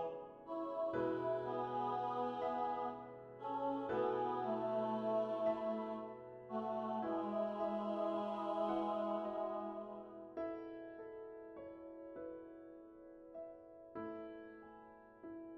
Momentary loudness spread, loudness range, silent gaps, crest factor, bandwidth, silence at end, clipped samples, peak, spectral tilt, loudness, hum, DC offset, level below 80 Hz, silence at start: 16 LU; 13 LU; none; 16 dB; 6.6 kHz; 0 s; under 0.1%; -26 dBFS; -8 dB/octave; -42 LUFS; none; under 0.1%; -78 dBFS; 0 s